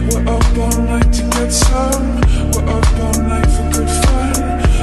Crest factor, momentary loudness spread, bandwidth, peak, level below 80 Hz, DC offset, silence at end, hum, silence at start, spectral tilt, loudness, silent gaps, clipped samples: 12 dB; 3 LU; 13 kHz; 0 dBFS; -14 dBFS; under 0.1%; 0 s; none; 0 s; -5 dB/octave; -15 LUFS; none; under 0.1%